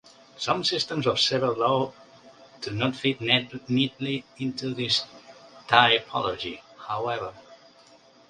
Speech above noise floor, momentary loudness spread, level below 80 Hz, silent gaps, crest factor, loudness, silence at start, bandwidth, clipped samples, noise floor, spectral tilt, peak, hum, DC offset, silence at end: 29 dB; 13 LU; -62 dBFS; none; 26 dB; -25 LUFS; 0.35 s; 10.5 kHz; under 0.1%; -55 dBFS; -4 dB/octave; -2 dBFS; none; under 0.1%; 0.75 s